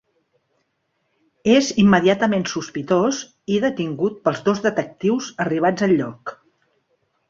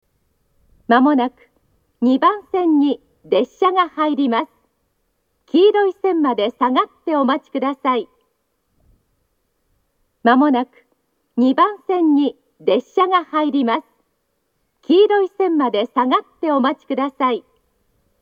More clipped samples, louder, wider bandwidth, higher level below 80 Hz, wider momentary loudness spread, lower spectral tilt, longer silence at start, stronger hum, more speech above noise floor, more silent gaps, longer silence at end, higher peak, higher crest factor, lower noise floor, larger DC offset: neither; second, -20 LUFS vs -17 LUFS; about the same, 7.6 kHz vs 7 kHz; first, -58 dBFS vs -68 dBFS; about the same, 11 LU vs 9 LU; about the same, -5.5 dB/octave vs -6.5 dB/octave; first, 1.45 s vs 0.9 s; neither; about the same, 52 dB vs 53 dB; neither; first, 0.95 s vs 0.8 s; about the same, -2 dBFS vs 0 dBFS; about the same, 18 dB vs 18 dB; about the same, -71 dBFS vs -69 dBFS; neither